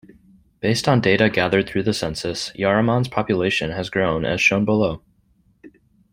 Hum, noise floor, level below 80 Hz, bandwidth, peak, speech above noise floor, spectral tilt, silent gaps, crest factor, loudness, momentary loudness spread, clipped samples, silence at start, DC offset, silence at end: none; -60 dBFS; -48 dBFS; 16 kHz; -2 dBFS; 41 dB; -5.5 dB/octave; none; 18 dB; -20 LUFS; 8 LU; under 0.1%; 0.65 s; under 0.1%; 0.45 s